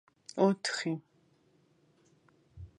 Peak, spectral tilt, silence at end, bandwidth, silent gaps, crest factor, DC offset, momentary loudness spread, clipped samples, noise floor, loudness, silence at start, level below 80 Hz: -12 dBFS; -5 dB/octave; 0.1 s; 11 kHz; none; 24 dB; under 0.1%; 15 LU; under 0.1%; -69 dBFS; -32 LUFS; 0.35 s; -64 dBFS